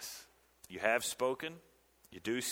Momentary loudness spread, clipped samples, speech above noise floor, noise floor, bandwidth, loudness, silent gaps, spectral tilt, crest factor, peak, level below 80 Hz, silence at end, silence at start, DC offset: 20 LU; under 0.1%; 26 dB; -62 dBFS; over 20 kHz; -36 LUFS; none; -2.5 dB/octave; 24 dB; -14 dBFS; -74 dBFS; 0 s; 0 s; under 0.1%